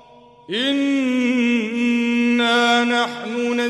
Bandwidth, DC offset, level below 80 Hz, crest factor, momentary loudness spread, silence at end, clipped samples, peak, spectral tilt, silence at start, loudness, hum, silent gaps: 11.5 kHz; under 0.1%; -68 dBFS; 14 dB; 7 LU; 0 s; under 0.1%; -6 dBFS; -3.5 dB/octave; 0.5 s; -18 LUFS; none; none